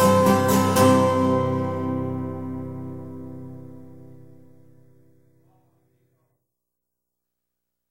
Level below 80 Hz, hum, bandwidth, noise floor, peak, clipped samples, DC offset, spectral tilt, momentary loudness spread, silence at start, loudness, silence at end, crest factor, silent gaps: -62 dBFS; 60 Hz at -65 dBFS; 16 kHz; -83 dBFS; -4 dBFS; under 0.1%; under 0.1%; -6 dB/octave; 22 LU; 0 s; -21 LUFS; 3.9 s; 20 dB; none